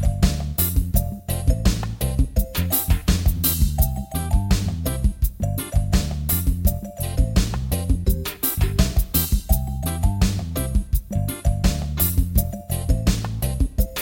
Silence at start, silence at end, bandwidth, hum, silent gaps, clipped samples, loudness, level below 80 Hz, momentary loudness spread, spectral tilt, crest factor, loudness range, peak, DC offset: 0 s; 0 s; 17 kHz; none; none; under 0.1%; -22 LUFS; -24 dBFS; 5 LU; -5 dB/octave; 18 dB; 1 LU; -4 dBFS; under 0.1%